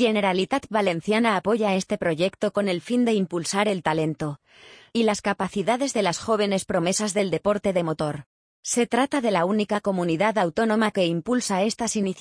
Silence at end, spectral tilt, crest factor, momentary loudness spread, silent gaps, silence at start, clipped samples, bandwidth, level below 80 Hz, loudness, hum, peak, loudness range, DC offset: 0 s; -4.5 dB/octave; 18 dB; 4 LU; 8.26-8.63 s; 0 s; under 0.1%; 10.5 kHz; -60 dBFS; -24 LUFS; none; -6 dBFS; 2 LU; under 0.1%